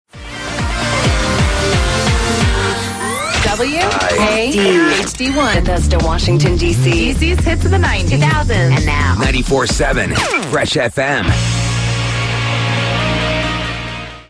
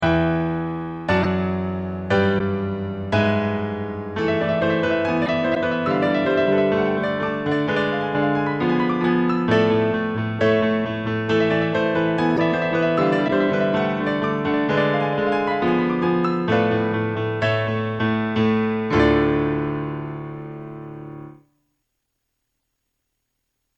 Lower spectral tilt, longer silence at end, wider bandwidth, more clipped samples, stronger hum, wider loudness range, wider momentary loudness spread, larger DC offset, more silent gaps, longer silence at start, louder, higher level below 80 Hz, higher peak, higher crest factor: second, -4.5 dB/octave vs -8 dB/octave; second, 0.05 s vs 2.45 s; first, 11 kHz vs 8.2 kHz; neither; neither; about the same, 2 LU vs 3 LU; second, 5 LU vs 8 LU; neither; neither; first, 0.15 s vs 0 s; first, -14 LUFS vs -21 LUFS; first, -22 dBFS vs -46 dBFS; first, 0 dBFS vs -4 dBFS; about the same, 14 dB vs 16 dB